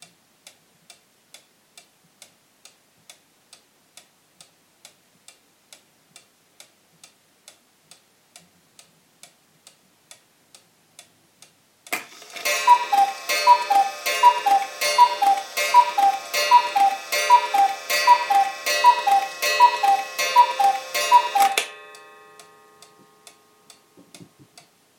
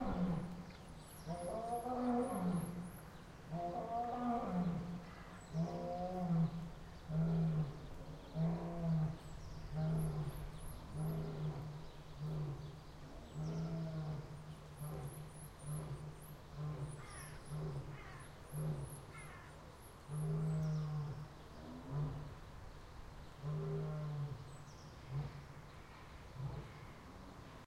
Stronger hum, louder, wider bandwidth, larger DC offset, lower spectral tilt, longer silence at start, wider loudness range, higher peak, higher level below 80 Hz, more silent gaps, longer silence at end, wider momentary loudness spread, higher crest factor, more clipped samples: neither; first, -19 LUFS vs -44 LUFS; first, 17 kHz vs 12.5 kHz; neither; second, 1 dB/octave vs -7.5 dB/octave; first, 11.9 s vs 0 s; about the same, 8 LU vs 7 LU; first, 0 dBFS vs -26 dBFS; second, -88 dBFS vs -56 dBFS; neither; first, 0.75 s vs 0 s; second, 7 LU vs 16 LU; about the same, 22 dB vs 18 dB; neither